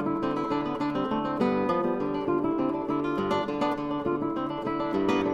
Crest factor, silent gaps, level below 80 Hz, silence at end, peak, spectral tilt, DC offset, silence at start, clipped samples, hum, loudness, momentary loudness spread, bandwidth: 14 dB; none; -56 dBFS; 0 s; -12 dBFS; -7.5 dB/octave; under 0.1%; 0 s; under 0.1%; none; -28 LUFS; 3 LU; 8.8 kHz